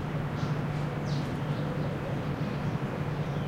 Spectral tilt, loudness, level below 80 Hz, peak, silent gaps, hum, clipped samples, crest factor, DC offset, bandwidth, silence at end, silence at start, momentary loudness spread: -7.5 dB/octave; -32 LUFS; -48 dBFS; -18 dBFS; none; none; under 0.1%; 14 dB; under 0.1%; 11 kHz; 0 s; 0 s; 1 LU